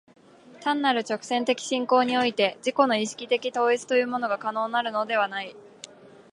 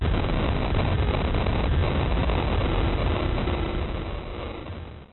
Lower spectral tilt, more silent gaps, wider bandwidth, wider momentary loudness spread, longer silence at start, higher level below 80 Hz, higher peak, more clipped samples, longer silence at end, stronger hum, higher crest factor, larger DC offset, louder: second, -3 dB/octave vs -11 dB/octave; neither; first, 11.5 kHz vs 4.2 kHz; about the same, 11 LU vs 10 LU; first, 0.5 s vs 0 s; second, -78 dBFS vs -28 dBFS; first, -6 dBFS vs -12 dBFS; neither; first, 0.25 s vs 0 s; neither; first, 20 dB vs 12 dB; second, under 0.1% vs 0.4%; about the same, -25 LUFS vs -26 LUFS